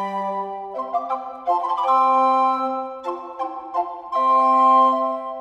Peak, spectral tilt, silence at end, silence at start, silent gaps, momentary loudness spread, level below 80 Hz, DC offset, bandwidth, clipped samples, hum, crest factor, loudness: -6 dBFS; -5.5 dB/octave; 0 s; 0 s; none; 15 LU; -68 dBFS; under 0.1%; 7.8 kHz; under 0.1%; none; 14 dB; -20 LUFS